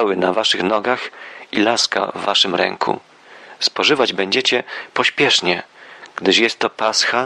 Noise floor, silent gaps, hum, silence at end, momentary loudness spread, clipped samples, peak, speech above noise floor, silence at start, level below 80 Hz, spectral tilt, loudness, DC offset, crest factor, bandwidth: -42 dBFS; none; none; 0 s; 9 LU; under 0.1%; -2 dBFS; 24 dB; 0 s; -66 dBFS; -2.5 dB/octave; -17 LUFS; under 0.1%; 18 dB; 12 kHz